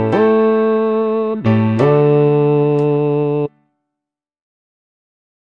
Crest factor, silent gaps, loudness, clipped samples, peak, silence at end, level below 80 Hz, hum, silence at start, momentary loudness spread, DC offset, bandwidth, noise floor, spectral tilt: 14 dB; none; -14 LUFS; under 0.1%; -2 dBFS; 1.95 s; -56 dBFS; none; 0 s; 5 LU; under 0.1%; 5.4 kHz; -83 dBFS; -10 dB/octave